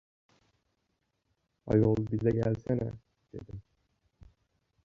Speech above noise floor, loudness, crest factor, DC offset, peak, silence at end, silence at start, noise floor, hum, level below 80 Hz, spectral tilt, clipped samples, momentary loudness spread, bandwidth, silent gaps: 50 dB; -30 LUFS; 22 dB; under 0.1%; -12 dBFS; 1.25 s; 1.65 s; -80 dBFS; none; -54 dBFS; -10.5 dB/octave; under 0.1%; 23 LU; 6.8 kHz; none